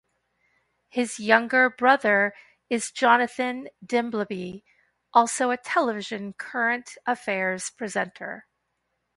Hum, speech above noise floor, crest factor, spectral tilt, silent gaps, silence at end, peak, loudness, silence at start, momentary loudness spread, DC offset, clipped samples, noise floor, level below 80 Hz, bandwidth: none; 52 dB; 24 dB; -3.5 dB/octave; none; 0.75 s; -2 dBFS; -24 LUFS; 0.95 s; 14 LU; under 0.1%; under 0.1%; -77 dBFS; -72 dBFS; 11.5 kHz